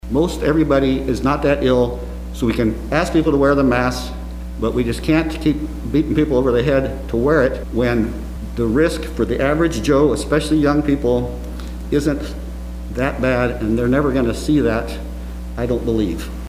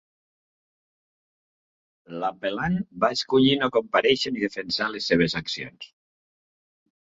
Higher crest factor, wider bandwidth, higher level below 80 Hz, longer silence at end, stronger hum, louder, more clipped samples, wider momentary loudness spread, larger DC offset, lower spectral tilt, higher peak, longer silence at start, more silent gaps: second, 16 dB vs 22 dB; first, 15.5 kHz vs 7.8 kHz; first, -28 dBFS vs -58 dBFS; second, 0 s vs 1.15 s; neither; first, -18 LUFS vs -24 LUFS; neither; about the same, 13 LU vs 12 LU; neither; first, -6.5 dB/octave vs -5 dB/octave; first, -2 dBFS vs -6 dBFS; second, 0.05 s vs 2.1 s; neither